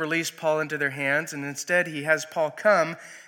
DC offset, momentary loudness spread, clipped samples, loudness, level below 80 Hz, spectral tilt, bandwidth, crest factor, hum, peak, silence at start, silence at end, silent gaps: under 0.1%; 7 LU; under 0.1%; -25 LUFS; -82 dBFS; -3.5 dB/octave; 17.5 kHz; 18 dB; none; -8 dBFS; 0 s; 0.05 s; none